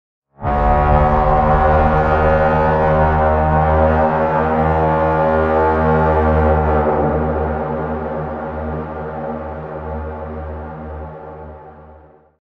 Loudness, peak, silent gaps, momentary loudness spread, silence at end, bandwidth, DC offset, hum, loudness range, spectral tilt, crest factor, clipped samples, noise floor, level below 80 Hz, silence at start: -16 LUFS; -2 dBFS; none; 14 LU; 0.5 s; 5.2 kHz; under 0.1%; none; 13 LU; -10 dB/octave; 14 dB; under 0.1%; -44 dBFS; -24 dBFS; 0.4 s